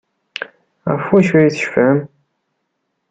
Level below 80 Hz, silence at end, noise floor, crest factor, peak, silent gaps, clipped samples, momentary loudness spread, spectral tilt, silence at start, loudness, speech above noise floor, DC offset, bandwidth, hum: -58 dBFS; 1.05 s; -71 dBFS; 16 dB; -2 dBFS; none; under 0.1%; 17 LU; -7 dB/octave; 0.4 s; -14 LUFS; 58 dB; under 0.1%; 9 kHz; none